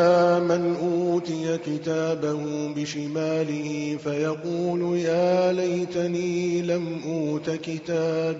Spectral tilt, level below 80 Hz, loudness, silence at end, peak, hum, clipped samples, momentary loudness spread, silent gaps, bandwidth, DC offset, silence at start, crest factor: -6 dB/octave; -66 dBFS; -25 LUFS; 0 s; -8 dBFS; none; under 0.1%; 7 LU; none; 7.8 kHz; under 0.1%; 0 s; 16 dB